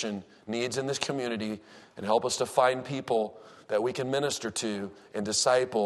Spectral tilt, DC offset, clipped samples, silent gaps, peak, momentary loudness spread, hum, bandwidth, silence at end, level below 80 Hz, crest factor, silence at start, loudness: -3.5 dB/octave; under 0.1%; under 0.1%; none; -8 dBFS; 12 LU; none; 12.5 kHz; 0 s; -70 dBFS; 22 dB; 0 s; -29 LUFS